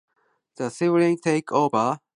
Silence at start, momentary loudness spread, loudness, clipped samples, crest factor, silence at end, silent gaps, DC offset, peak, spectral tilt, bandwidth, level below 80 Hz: 0.6 s; 9 LU; -22 LUFS; under 0.1%; 18 dB; 0.2 s; none; under 0.1%; -6 dBFS; -6.5 dB/octave; 11 kHz; -72 dBFS